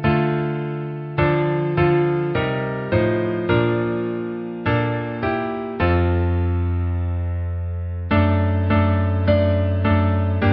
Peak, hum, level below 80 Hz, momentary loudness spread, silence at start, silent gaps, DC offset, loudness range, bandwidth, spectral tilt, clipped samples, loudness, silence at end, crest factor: -4 dBFS; none; -28 dBFS; 8 LU; 0 s; none; under 0.1%; 2 LU; 5 kHz; -12.5 dB/octave; under 0.1%; -21 LUFS; 0 s; 16 dB